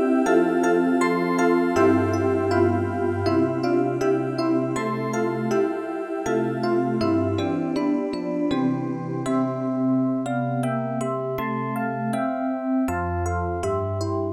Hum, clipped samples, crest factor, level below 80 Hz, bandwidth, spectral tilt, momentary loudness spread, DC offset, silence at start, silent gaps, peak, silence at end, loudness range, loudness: none; under 0.1%; 14 dB; -50 dBFS; 14.5 kHz; -7 dB/octave; 7 LU; under 0.1%; 0 s; none; -8 dBFS; 0 s; 4 LU; -23 LUFS